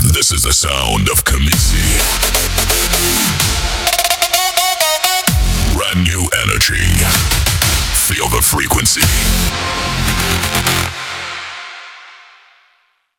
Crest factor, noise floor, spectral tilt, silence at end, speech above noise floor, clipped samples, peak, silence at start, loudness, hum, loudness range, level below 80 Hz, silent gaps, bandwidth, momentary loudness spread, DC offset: 14 dB; -58 dBFS; -2.5 dB/octave; 1.05 s; 45 dB; under 0.1%; 0 dBFS; 0 s; -13 LUFS; none; 4 LU; -22 dBFS; none; over 20 kHz; 5 LU; under 0.1%